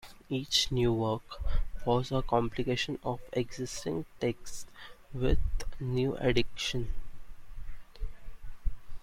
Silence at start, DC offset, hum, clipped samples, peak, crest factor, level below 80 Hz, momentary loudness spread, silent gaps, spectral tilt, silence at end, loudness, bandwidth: 0.05 s; under 0.1%; none; under 0.1%; -12 dBFS; 18 dB; -38 dBFS; 19 LU; none; -5 dB/octave; 0 s; -32 LUFS; 14 kHz